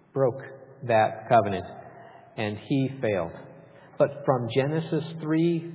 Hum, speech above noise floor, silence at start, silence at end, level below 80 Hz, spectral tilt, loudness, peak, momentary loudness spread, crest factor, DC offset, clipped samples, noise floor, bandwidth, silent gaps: none; 24 dB; 0.15 s; 0 s; -60 dBFS; -11 dB/octave; -26 LUFS; -8 dBFS; 19 LU; 18 dB; under 0.1%; under 0.1%; -50 dBFS; 4 kHz; none